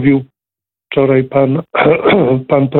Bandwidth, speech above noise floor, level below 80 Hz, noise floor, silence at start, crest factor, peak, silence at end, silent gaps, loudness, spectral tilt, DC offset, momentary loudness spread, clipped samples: 4.2 kHz; 76 dB; -48 dBFS; -87 dBFS; 0 s; 12 dB; 0 dBFS; 0 s; none; -12 LUFS; -11 dB/octave; under 0.1%; 5 LU; under 0.1%